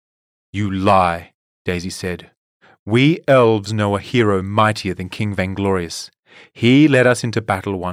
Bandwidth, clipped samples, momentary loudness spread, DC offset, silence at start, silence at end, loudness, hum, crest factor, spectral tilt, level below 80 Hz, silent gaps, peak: 15 kHz; under 0.1%; 15 LU; under 0.1%; 0.55 s; 0 s; -17 LUFS; none; 14 dB; -6 dB/octave; -52 dBFS; 1.35-1.65 s, 2.37-2.60 s, 2.79-2.86 s, 6.19-6.23 s; -4 dBFS